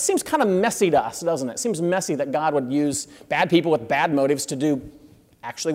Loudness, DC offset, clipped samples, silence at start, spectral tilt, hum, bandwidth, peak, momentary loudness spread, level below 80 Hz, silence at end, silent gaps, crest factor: -22 LUFS; under 0.1%; under 0.1%; 0 s; -4.5 dB/octave; none; 16 kHz; -6 dBFS; 7 LU; -60 dBFS; 0 s; none; 16 dB